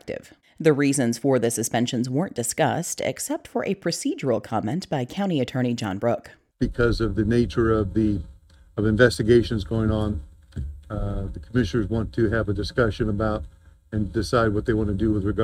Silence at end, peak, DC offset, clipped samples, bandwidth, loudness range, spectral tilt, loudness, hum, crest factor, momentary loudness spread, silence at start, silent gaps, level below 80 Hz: 0 s; -2 dBFS; under 0.1%; under 0.1%; 16 kHz; 4 LU; -5.5 dB/octave; -24 LUFS; none; 22 dB; 11 LU; 0.05 s; none; -38 dBFS